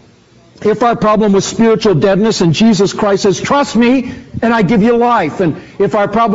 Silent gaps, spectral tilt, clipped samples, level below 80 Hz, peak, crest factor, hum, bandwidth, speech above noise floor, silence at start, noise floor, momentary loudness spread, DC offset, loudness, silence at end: none; -5 dB/octave; under 0.1%; -42 dBFS; -2 dBFS; 10 dB; none; 8 kHz; 34 dB; 0.6 s; -44 dBFS; 6 LU; under 0.1%; -11 LUFS; 0 s